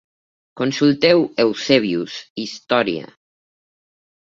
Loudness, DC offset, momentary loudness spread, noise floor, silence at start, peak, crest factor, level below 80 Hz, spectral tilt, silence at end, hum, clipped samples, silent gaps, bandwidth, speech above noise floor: -18 LUFS; under 0.1%; 14 LU; under -90 dBFS; 0.55 s; -2 dBFS; 18 dB; -62 dBFS; -5 dB/octave; 1.3 s; none; under 0.1%; 2.30-2.36 s; 7.6 kHz; over 72 dB